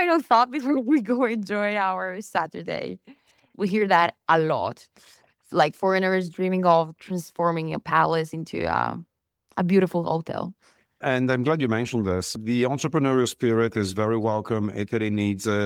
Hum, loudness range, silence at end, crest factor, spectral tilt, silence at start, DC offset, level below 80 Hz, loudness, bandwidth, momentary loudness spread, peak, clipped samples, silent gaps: none; 2 LU; 0 s; 18 dB; -6 dB/octave; 0 s; under 0.1%; -62 dBFS; -24 LUFS; 17 kHz; 11 LU; -6 dBFS; under 0.1%; none